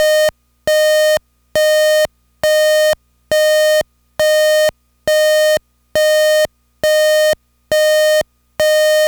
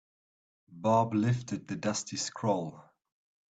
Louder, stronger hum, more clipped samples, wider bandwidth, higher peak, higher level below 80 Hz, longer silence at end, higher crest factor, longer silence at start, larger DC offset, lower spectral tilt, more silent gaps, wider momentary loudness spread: first, -14 LUFS vs -31 LUFS; neither; neither; first, over 20 kHz vs 9.2 kHz; first, -4 dBFS vs -14 dBFS; first, -50 dBFS vs -68 dBFS; second, 0 s vs 0.7 s; second, 10 dB vs 18 dB; second, 0 s vs 0.7 s; neither; second, -0.5 dB/octave vs -5.5 dB/octave; neither; about the same, 9 LU vs 9 LU